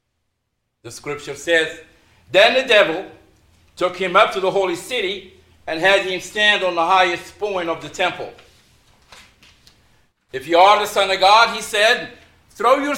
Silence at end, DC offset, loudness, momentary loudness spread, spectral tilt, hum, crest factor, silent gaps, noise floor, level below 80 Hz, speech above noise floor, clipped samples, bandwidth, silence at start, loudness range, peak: 0 s; under 0.1%; -17 LUFS; 17 LU; -2.5 dB/octave; none; 18 dB; none; -74 dBFS; -56 dBFS; 56 dB; under 0.1%; 16.5 kHz; 0.85 s; 5 LU; 0 dBFS